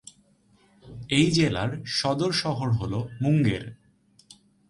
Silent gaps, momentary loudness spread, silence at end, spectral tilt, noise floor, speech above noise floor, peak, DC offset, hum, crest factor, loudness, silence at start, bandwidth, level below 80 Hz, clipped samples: none; 12 LU; 0.95 s; -5.5 dB/octave; -62 dBFS; 37 dB; -8 dBFS; under 0.1%; none; 18 dB; -25 LUFS; 0.85 s; 11.5 kHz; -52 dBFS; under 0.1%